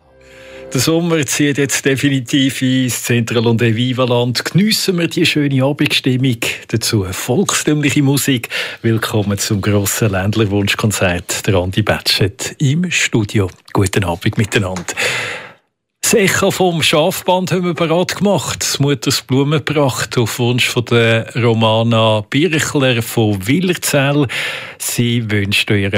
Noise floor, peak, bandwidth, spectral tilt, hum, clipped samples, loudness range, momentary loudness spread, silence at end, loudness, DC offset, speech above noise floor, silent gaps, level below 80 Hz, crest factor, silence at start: -56 dBFS; -2 dBFS; 16 kHz; -4.5 dB/octave; none; under 0.1%; 2 LU; 5 LU; 0 s; -15 LUFS; under 0.1%; 41 dB; none; -52 dBFS; 14 dB; 0.35 s